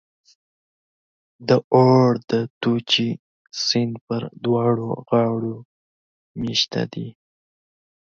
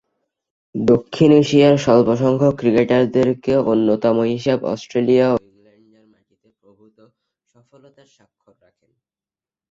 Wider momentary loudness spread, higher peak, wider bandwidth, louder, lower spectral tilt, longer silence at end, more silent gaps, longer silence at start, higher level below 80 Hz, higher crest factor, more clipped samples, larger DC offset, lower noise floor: first, 18 LU vs 8 LU; about the same, -4 dBFS vs -2 dBFS; about the same, 7.6 kHz vs 7.8 kHz; second, -21 LUFS vs -16 LUFS; second, -5.5 dB/octave vs -7 dB/octave; second, 1 s vs 4.35 s; first, 1.64-1.71 s, 2.24-2.28 s, 2.50-2.61 s, 3.19-3.45 s, 4.01-4.07 s, 5.65-6.35 s vs none; first, 1.4 s vs 0.75 s; second, -60 dBFS vs -54 dBFS; about the same, 18 dB vs 16 dB; neither; neither; about the same, under -90 dBFS vs under -90 dBFS